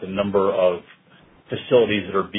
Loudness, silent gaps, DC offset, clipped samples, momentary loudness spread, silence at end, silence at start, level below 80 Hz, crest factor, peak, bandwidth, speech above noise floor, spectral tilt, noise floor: -20 LUFS; none; under 0.1%; under 0.1%; 14 LU; 0 s; 0 s; -58 dBFS; 18 dB; -4 dBFS; 3.9 kHz; 33 dB; -10 dB/octave; -53 dBFS